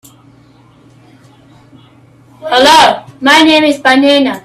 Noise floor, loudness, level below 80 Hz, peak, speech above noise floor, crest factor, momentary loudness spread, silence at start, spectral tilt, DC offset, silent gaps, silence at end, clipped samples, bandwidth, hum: -43 dBFS; -7 LUFS; -50 dBFS; 0 dBFS; 36 dB; 12 dB; 8 LU; 2.4 s; -2.5 dB/octave; under 0.1%; none; 0.05 s; 0.2%; 15 kHz; none